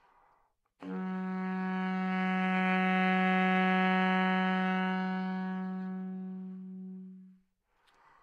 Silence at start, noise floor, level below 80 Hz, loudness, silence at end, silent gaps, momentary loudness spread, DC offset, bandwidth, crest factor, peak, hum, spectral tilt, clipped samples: 0.8 s; -73 dBFS; -84 dBFS; -31 LUFS; 0.9 s; none; 17 LU; under 0.1%; 5.2 kHz; 16 dB; -16 dBFS; none; -8 dB/octave; under 0.1%